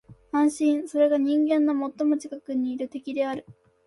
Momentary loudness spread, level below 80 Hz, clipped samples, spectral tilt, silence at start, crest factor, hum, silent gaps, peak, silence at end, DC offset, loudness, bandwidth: 9 LU; -68 dBFS; under 0.1%; -5 dB/octave; 0.1 s; 14 dB; none; none; -12 dBFS; 0.35 s; under 0.1%; -25 LUFS; 11.5 kHz